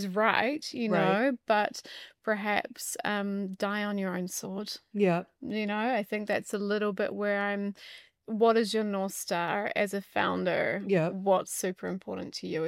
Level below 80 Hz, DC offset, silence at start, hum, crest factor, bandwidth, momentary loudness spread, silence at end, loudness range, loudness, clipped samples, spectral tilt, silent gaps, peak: -76 dBFS; under 0.1%; 0 s; none; 22 dB; 16.5 kHz; 11 LU; 0 s; 3 LU; -30 LUFS; under 0.1%; -4.5 dB/octave; none; -8 dBFS